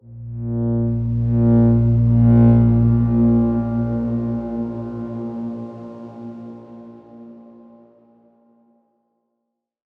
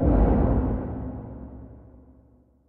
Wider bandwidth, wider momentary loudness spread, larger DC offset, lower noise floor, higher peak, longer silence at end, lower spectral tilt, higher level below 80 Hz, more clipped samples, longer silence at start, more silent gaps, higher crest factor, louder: second, 2.3 kHz vs 3 kHz; about the same, 21 LU vs 23 LU; neither; first, -77 dBFS vs -57 dBFS; first, -4 dBFS vs -8 dBFS; first, 2.6 s vs 0.9 s; about the same, -13 dB/octave vs -13.5 dB/octave; second, -34 dBFS vs -28 dBFS; neither; about the same, 0.1 s vs 0 s; neither; about the same, 16 dB vs 16 dB; first, -18 LUFS vs -25 LUFS